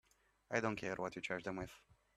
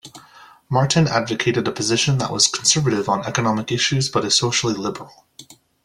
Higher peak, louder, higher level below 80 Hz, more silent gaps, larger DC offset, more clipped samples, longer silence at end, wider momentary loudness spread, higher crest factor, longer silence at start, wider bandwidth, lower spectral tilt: second, -20 dBFS vs -2 dBFS; second, -42 LUFS vs -19 LUFS; second, -68 dBFS vs -54 dBFS; neither; neither; neither; about the same, 0.4 s vs 0.3 s; about the same, 8 LU vs 6 LU; about the same, 24 dB vs 20 dB; first, 0.5 s vs 0.05 s; about the same, 14.5 kHz vs 13.5 kHz; first, -5 dB/octave vs -3.5 dB/octave